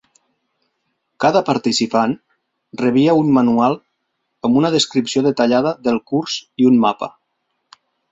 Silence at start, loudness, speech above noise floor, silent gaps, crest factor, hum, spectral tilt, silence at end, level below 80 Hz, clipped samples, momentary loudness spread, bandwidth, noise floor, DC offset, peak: 1.2 s; -16 LUFS; 57 dB; none; 16 dB; none; -5 dB/octave; 1.05 s; -60 dBFS; under 0.1%; 11 LU; 8 kHz; -72 dBFS; under 0.1%; -2 dBFS